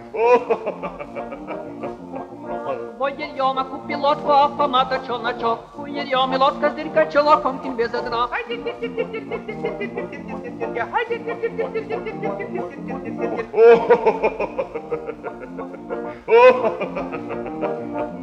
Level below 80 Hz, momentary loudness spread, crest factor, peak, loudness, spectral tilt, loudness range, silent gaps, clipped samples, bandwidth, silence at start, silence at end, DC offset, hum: -54 dBFS; 16 LU; 20 dB; 0 dBFS; -21 LUFS; -6 dB/octave; 7 LU; none; under 0.1%; 7.4 kHz; 0 s; 0 s; under 0.1%; none